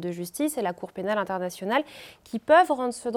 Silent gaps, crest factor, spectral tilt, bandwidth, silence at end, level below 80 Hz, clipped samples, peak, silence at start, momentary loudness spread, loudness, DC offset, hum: none; 18 dB; -4.5 dB/octave; 17.5 kHz; 0 s; -68 dBFS; under 0.1%; -8 dBFS; 0 s; 16 LU; -25 LUFS; under 0.1%; none